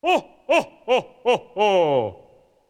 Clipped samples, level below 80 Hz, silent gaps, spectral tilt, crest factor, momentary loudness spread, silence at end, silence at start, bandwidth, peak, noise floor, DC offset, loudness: under 0.1%; -64 dBFS; none; -4.5 dB/octave; 16 dB; 5 LU; 0.55 s; 0.05 s; 14.5 kHz; -6 dBFS; -53 dBFS; under 0.1%; -21 LUFS